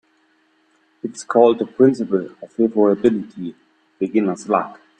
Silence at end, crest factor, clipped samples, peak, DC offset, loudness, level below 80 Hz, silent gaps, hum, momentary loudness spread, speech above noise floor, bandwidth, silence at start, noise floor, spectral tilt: 0.25 s; 20 dB; under 0.1%; 0 dBFS; under 0.1%; -18 LUFS; -62 dBFS; none; none; 16 LU; 43 dB; 9.4 kHz; 1.05 s; -61 dBFS; -7 dB/octave